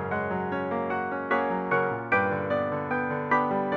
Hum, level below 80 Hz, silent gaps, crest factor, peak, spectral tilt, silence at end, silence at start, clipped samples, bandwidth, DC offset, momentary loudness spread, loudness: none; -66 dBFS; none; 16 dB; -10 dBFS; -8.5 dB/octave; 0 s; 0 s; under 0.1%; 7 kHz; under 0.1%; 5 LU; -27 LUFS